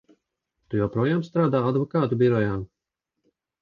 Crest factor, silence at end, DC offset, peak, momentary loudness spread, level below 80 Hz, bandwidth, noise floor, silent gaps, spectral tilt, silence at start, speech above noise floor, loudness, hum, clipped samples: 18 dB; 0.95 s; under 0.1%; -8 dBFS; 9 LU; -54 dBFS; 7.2 kHz; -84 dBFS; none; -9.5 dB/octave; 0.7 s; 61 dB; -24 LUFS; none; under 0.1%